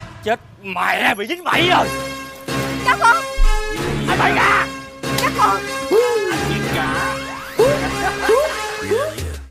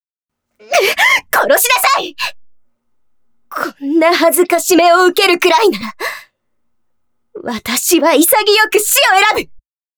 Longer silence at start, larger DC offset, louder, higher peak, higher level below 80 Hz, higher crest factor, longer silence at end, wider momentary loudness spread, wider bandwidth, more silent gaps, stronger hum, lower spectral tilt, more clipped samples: second, 0 s vs 0.7 s; neither; second, -18 LUFS vs -11 LUFS; second, -4 dBFS vs 0 dBFS; first, -28 dBFS vs -56 dBFS; about the same, 14 dB vs 12 dB; second, 0 s vs 0.4 s; about the same, 11 LU vs 13 LU; second, 16 kHz vs over 20 kHz; neither; neither; first, -4 dB/octave vs -1 dB/octave; neither